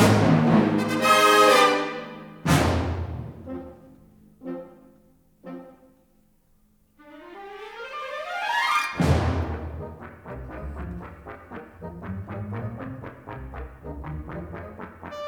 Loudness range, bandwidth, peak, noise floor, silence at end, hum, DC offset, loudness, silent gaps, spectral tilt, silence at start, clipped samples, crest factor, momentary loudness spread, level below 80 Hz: 23 LU; over 20 kHz; -4 dBFS; -62 dBFS; 0 s; none; under 0.1%; -22 LUFS; none; -5 dB/octave; 0 s; under 0.1%; 20 dB; 23 LU; -42 dBFS